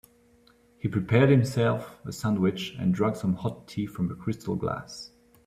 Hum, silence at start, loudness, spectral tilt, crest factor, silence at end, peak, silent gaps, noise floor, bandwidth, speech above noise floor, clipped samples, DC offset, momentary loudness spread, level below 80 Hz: none; 0.85 s; -27 LUFS; -7 dB/octave; 20 dB; 0.4 s; -8 dBFS; none; -60 dBFS; 15 kHz; 34 dB; under 0.1%; under 0.1%; 14 LU; -58 dBFS